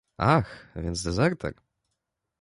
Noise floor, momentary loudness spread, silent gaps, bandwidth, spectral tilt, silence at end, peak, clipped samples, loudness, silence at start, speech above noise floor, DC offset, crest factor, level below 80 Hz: -82 dBFS; 13 LU; none; 11.5 kHz; -6 dB/octave; 0.9 s; -8 dBFS; under 0.1%; -27 LUFS; 0.2 s; 56 dB; under 0.1%; 20 dB; -44 dBFS